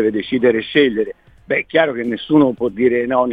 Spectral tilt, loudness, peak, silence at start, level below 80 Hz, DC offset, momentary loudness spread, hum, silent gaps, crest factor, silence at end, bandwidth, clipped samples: -8 dB/octave; -17 LUFS; -2 dBFS; 0 s; -52 dBFS; under 0.1%; 7 LU; none; none; 16 dB; 0 s; 4.9 kHz; under 0.1%